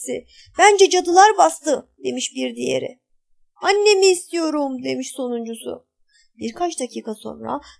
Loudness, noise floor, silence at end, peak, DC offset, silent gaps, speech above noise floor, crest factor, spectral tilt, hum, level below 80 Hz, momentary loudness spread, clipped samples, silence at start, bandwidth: -18 LUFS; -60 dBFS; 0.2 s; 0 dBFS; under 0.1%; none; 41 dB; 20 dB; -2 dB/octave; none; -62 dBFS; 19 LU; under 0.1%; 0 s; 11 kHz